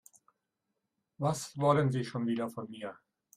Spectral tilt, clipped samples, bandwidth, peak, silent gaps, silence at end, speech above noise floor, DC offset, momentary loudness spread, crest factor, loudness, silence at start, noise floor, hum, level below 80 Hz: -6.5 dB/octave; under 0.1%; 15 kHz; -14 dBFS; none; 0.45 s; 53 dB; under 0.1%; 15 LU; 22 dB; -32 LUFS; 1.2 s; -85 dBFS; none; -72 dBFS